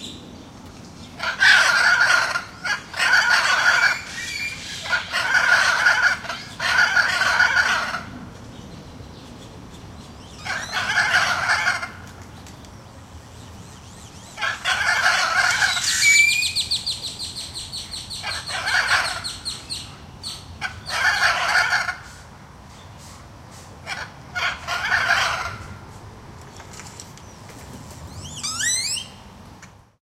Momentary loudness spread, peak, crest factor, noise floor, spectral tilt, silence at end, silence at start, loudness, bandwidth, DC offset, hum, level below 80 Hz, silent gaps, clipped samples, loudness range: 25 LU; -2 dBFS; 20 dB; -46 dBFS; -0.5 dB/octave; 0.45 s; 0 s; -19 LUFS; 16 kHz; under 0.1%; none; -50 dBFS; none; under 0.1%; 10 LU